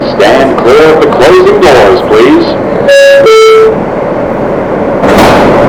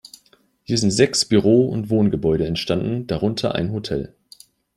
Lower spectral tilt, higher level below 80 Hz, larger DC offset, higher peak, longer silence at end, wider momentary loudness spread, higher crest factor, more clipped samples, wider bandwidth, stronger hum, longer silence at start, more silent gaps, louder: about the same, -5 dB/octave vs -5.5 dB/octave; first, -28 dBFS vs -46 dBFS; neither; about the same, 0 dBFS vs -2 dBFS; second, 0 s vs 0.7 s; about the same, 9 LU vs 9 LU; second, 4 dB vs 18 dB; first, 30% vs under 0.1%; first, over 20 kHz vs 13.5 kHz; neither; second, 0 s vs 0.7 s; neither; first, -4 LUFS vs -20 LUFS